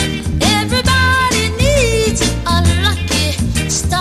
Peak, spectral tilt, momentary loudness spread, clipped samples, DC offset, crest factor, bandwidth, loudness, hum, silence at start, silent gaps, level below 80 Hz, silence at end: 0 dBFS; -4 dB/octave; 4 LU; under 0.1%; under 0.1%; 14 dB; 15 kHz; -14 LUFS; none; 0 s; none; -22 dBFS; 0 s